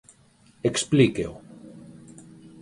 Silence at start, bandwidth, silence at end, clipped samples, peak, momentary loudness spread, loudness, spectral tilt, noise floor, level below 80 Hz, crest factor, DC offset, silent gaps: 0.65 s; 11.5 kHz; 0.8 s; under 0.1%; -6 dBFS; 26 LU; -23 LUFS; -5 dB/octave; -57 dBFS; -56 dBFS; 22 dB; under 0.1%; none